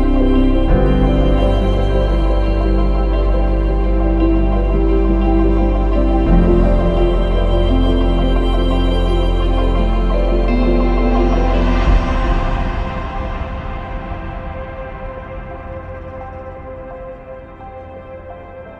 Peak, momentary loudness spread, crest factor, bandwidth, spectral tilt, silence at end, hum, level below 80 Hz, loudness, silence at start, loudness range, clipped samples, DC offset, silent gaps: -2 dBFS; 16 LU; 12 dB; 5.6 kHz; -8.5 dB/octave; 0 s; none; -16 dBFS; -16 LUFS; 0 s; 14 LU; under 0.1%; under 0.1%; none